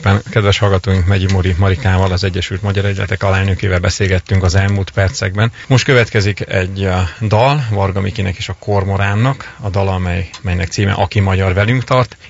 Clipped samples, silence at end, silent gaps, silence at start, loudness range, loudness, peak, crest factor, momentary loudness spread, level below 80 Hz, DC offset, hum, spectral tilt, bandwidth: under 0.1%; 0 s; none; 0 s; 2 LU; -15 LUFS; 0 dBFS; 14 dB; 6 LU; -32 dBFS; under 0.1%; none; -6 dB/octave; 7.8 kHz